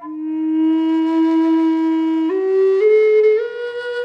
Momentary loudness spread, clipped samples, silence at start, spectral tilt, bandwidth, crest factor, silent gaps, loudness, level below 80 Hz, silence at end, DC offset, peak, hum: 10 LU; under 0.1%; 0 s; -5.5 dB/octave; 5.6 kHz; 10 dB; none; -16 LUFS; -76 dBFS; 0 s; under 0.1%; -6 dBFS; none